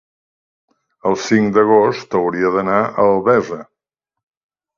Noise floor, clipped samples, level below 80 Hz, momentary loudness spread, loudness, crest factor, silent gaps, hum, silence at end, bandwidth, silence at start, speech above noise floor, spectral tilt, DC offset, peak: -83 dBFS; under 0.1%; -56 dBFS; 9 LU; -15 LUFS; 18 dB; none; none; 1.15 s; 7.4 kHz; 1.05 s; 68 dB; -6 dB/octave; under 0.1%; 0 dBFS